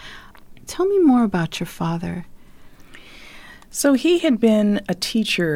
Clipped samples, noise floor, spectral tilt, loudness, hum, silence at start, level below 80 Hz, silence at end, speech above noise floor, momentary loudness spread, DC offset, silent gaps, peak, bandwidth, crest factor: under 0.1%; -42 dBFS; -5 dB/octave; -19 LUFS; none; 0 s; -48 dBFS; 0 s; 24 dB; 18 LU; under 0.1%; none; -6 dBFS; 17 kHz; 14 dB